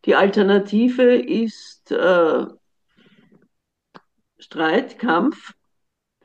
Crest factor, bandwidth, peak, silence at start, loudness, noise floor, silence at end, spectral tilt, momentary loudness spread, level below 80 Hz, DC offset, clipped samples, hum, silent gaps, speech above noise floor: 16 dB; 8.2 kHz; -4 dBFS; 0.05 s; -18 LUFS; -74 dBFS; 0.75 s; -6.5 dB/octave; 14 LU; -72 dBFS; under 0.1%; under 0.1%; none; none; 57 dB